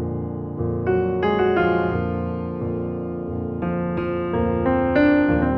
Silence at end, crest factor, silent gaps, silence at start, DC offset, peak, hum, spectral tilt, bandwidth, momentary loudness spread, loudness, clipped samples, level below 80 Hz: 0 s; 14 dB; none; 0 s; under 0.1%; -6 dBFS; none; -10.5 dB/octave; 5.8 kHz; 10 LU; -22 LUFS; under 0.1%; -40 dBFS